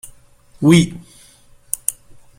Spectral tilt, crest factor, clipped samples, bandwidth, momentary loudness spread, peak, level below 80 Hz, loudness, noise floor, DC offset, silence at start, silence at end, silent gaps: -5 dB/octave; 20 dB; under 0.1%; 16.5 kHz; 14 LU; 0 dBFS; -48 dBFS; -17 LUFS; -48 dBFS; under 0.1%; 0.6 s; 0.45 s; none